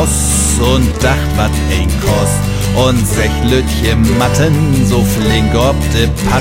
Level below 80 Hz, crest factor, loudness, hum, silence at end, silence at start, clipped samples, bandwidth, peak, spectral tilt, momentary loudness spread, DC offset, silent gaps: -18 dBFS; 10 dB; -12 LUFS; none; 0 s; 0 s; under 0.1%; 16.5 kHz; 0 dBFS; -5 dB/octave; 3 LU; under 0.1%; none